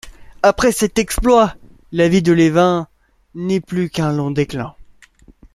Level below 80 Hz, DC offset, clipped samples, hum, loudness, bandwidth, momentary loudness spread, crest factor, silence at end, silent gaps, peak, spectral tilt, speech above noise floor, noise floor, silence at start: -34 dBFS; under 0.1%; under 0.1%; none; -16 LUFS; 15 kHz; 12 LU; 16 dB; 0.7 s; none; -2 dBFS; -5.5 dB/octave; 33 dB; -48 dBFS; 0.05 s